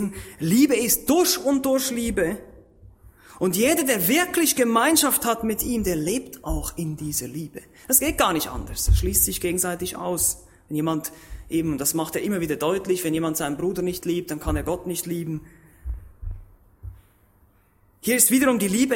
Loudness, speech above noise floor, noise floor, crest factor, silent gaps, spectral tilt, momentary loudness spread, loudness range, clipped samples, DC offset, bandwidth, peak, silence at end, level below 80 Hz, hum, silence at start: -22 LUFS; 37 dB; -59 dBFS; 22 dB; none; -3.5 dB/octave; 16 LU; 8 LU; under 0.1%; under 0.1%; 16.5 kHz; -2 dBFS; 0 s; -36 dBFS; none; 0 s